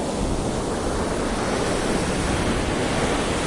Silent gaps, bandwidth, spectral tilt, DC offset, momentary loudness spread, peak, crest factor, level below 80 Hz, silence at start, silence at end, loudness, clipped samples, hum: none; 11.5 kHz; -4.5 dB/octave; under 0.1%; 3 LU; -10 dBFS; 14 dB; -32 dBFS; 0 s; 0 s; -24 LUFS; under 0.1%; none